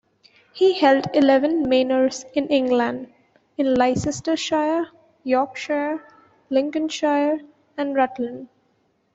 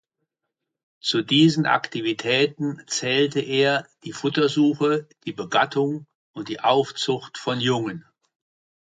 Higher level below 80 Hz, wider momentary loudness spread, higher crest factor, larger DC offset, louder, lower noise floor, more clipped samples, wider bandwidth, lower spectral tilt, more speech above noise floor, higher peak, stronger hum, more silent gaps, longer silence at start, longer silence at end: first, -56 dBFS vs -68 dBFS; about the same, 13 LU vs 14 LU; about the same, 18 dB vs 18 dB; neither; about the same, -21 LUFS vs -22 LUFS; second, -66 dBFS vs -82 dBFS; neither; second, 8 kHz vs 9.4 kHz; about the same, -4.5 dB/octave vs -4.5 dB/octave; second, 45 dB vs 60 dB; about the same, -4 dBFS vs -4 dBFS; neither; second, none vs 6.15-6.34 s; second, 0.55 s vs 1.05 s; about the same, 0.7 s vs 0.8 s